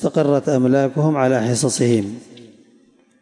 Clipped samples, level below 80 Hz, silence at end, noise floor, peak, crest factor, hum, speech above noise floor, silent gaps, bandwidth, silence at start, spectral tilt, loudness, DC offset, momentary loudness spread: under 0.1%; -64 dBFS; 0.8 s; -54 dBFS; -6 dBFS; 14 dB; none; 37 dB; none; 11.5 kHz; 0 s; -6 dB/octave; -17 LUFS; under 0.1%; 4 LU